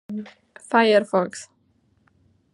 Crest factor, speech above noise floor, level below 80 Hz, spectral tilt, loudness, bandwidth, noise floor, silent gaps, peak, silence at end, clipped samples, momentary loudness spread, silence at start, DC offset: 20 dB; 42 dB; -76 dBFS; -4.5 dB/octave; -20 LUFS; 11.5 kHz; -64 dBFS; none; -4 dBFS; 1.1 s; under 0.1%; 21 LU; 0.1 s; under 0.1%